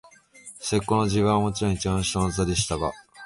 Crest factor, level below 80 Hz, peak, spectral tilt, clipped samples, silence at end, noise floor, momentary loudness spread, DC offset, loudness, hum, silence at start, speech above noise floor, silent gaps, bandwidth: 16 dB; -42 dBFS; -10 dBFS; -5 dB/octave; under 0.1%; 0 s; -48 dBFS; 8 LU; under 0.1%; -25 LUFS; none; 0.45 s; 24 dB; none; 11.5 kHz